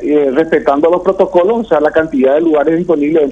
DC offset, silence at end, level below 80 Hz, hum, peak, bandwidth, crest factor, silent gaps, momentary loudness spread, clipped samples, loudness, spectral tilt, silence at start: under 0.1%; 0 s; -44 dBFS; none; 0 dBFS; 7.8 kHz; 10 dB; none; 1 LU; 0.2%; -11 LUFS; -7.5 dB/octave; 0 s